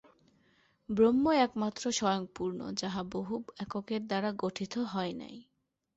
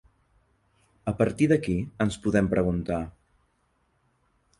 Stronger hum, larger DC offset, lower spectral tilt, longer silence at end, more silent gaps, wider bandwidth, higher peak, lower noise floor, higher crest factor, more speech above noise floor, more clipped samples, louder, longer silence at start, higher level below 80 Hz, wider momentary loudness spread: neither; neither; second, -5 dB/octave vs -7.5 dB/octave; second, 0.55 s vs 1.5 s; neither; second, 8.2 kHz vs 11.5 kHz; second, -16 dBFS vs -8 dBFS; about the same, -69 dBFS vs -70 dBFS; about the same, 18 dB vs 20 dB; second, 37 dB vs 45 dB; neither; second, -32 LUFS vs -26 LUFS; second, 0.9 s vs 1.05 s; second, -66 dBFS vs -46 dBFS; about the same, 12 LU vs 10 LU